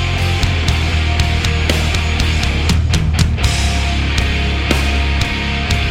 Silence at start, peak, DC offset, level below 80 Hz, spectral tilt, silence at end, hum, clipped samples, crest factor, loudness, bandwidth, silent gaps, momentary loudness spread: 0 s; 0 dBFS; under 0.1%; -18 dBFS; -4.5 dB/octave; 0 s; none; under 0.1%; 14 dB; -16 LUFS; 15.5 kHz; none; 2 LU